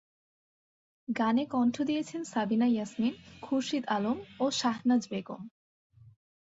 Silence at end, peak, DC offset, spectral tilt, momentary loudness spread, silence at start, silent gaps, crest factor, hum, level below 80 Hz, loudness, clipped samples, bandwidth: 1 s; -16 dBFS; under 0.1%; -4.5 dB/octave; 12 LU; 1.1 s; none; 16 dB; none; -72 dBFS; -31 LUFS; under 0.1%; 8 kHz